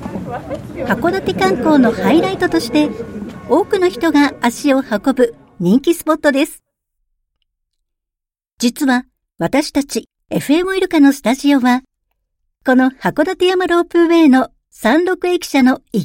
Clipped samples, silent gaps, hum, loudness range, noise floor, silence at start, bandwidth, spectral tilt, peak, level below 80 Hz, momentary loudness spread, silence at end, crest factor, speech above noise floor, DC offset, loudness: under 0.1%; 8.53-8.57 s; none; 6 LU; -84 dBFS; 0 s; 17 kHz; -5 dB/octave; 0 dBFS; -48 dBFS; 11 LU; 0 s; 14 dB; 70 dB; under 0.1%; -15 LUFS